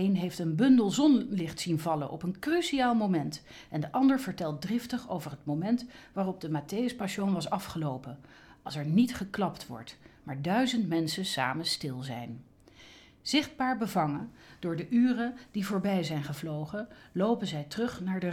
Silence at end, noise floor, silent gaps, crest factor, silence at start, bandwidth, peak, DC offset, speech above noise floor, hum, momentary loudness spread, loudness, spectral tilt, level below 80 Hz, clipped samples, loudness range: 0 s; -55 dBFS; none; 18 dB; 0 s; 16 kHz; -12 dBFS; under 0.1%; 25 dB; none; 14 LU; -31 LUFS; -5.5 dB/octave; -64 dBFS; under 0.1%; 4 LU